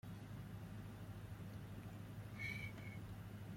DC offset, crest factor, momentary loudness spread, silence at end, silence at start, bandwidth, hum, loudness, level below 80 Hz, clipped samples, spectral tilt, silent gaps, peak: under 0.1%; 16 dB; 6 LU; 0 s; 0.05 s; 16.5 kHz; none; -52 LUFS; -64 dBFS; under 0.1%; -6 dB/octave; none; -36 dBFS